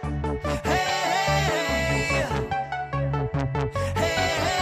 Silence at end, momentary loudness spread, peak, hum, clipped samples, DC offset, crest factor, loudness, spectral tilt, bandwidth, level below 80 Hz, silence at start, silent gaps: 0 s; 6 LU; -12 dBFS; none; under 0.1%; under 0.1%; 14 dB; -25 LUFS; -4.5 dB/octave; 15.5 kHz; -38 dBFS; 0 s; none